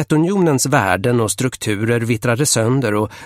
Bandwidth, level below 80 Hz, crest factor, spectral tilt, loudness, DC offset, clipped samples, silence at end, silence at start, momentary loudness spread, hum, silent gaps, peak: 16.5 kHz; -50 dBFS; 16 dB; -5 dB/octave; -16 LUFS; under 0.1%; under 0.1%; 0 s; 0 s; 5 LU; none; none; 0 dBFS